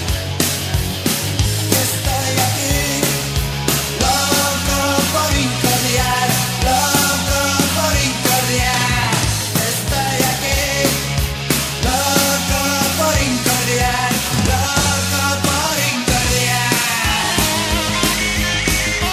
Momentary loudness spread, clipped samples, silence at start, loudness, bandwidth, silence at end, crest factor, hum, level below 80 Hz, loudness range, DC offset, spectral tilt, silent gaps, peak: 3 LU; under 0.1%; 0 s; -16 LUFS; 19 kHz; 0 s; 16 dB; none; -28 dBFS; 2 LU; under 0.1%; -3 dB/octave; none; 0 dBFS